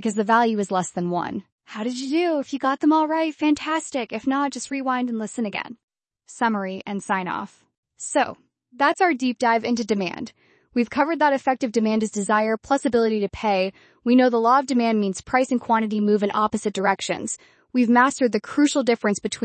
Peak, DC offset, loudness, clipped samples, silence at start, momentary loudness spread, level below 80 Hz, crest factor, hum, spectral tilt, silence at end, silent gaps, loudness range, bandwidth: -4 dBFS; under 0.1%; -22 LUFS; under 0.1%; 0 s; 10 LU; -60 dBFS; 18 dB; none; -4.5 dB/octave; 0 s; 1.52-1.58 s, 5.84-5.88 s, 7.78-7.83 s; 6 LU; 8.8 kHz